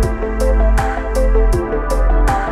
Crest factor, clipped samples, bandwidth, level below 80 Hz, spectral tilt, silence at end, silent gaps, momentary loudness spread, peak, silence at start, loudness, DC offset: 10 dB; under 0.1%; 13 kHz; -14 dBFS; -6.5 dB/octave; 0 s; none; 4 LU; -4 dBFS; 0 s; -17 LUFS; under 0.1%